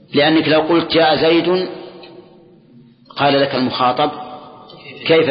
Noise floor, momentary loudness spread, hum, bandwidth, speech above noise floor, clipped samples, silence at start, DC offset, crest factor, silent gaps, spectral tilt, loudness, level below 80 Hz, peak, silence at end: -46 dBFS; 21 LU; none; 5.6 kHz; 32 dB; under 0.1%; 0.1 s; under 0.1%; 14 dB; none; -10.5 dB/octave; -15 LUFS; -54 dBFS; -2 dBFS; 0 s